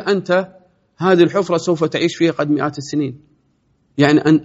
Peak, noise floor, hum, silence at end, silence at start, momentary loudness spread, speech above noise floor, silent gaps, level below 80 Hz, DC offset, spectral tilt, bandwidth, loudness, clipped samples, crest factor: 0 dBFS; -61 dBFS; none; 0 s; 0 s; 9 LU; 46 dB; none; -58 dBFS; under 0.1%; -5 dB/octave; 8 kHz; -17 LUFS; under 0.1%; 16 dB